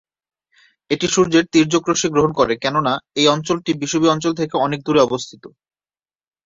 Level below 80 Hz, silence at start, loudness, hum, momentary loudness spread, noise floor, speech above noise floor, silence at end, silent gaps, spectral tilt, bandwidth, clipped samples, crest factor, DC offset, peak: -54 dBFS; 0.9 s; -17 LUFS; none; 6 LU; under -90 dBFS; over 73 dB; 1 s; none; -4 dB/octave; 7.8 kHz; under 0.1%; 18 dB; under 0.1%; -2 dBFS